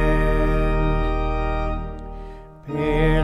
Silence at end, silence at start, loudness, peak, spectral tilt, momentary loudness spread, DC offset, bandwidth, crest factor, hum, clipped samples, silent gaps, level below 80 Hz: 0 s; 0 s; -23 LUFS; -6 dBFS; -8 dB/octave; 17 LU; under 0.1%; 5.2 kHz; 14 dB; none; under 0.1%; none; -24 dBFS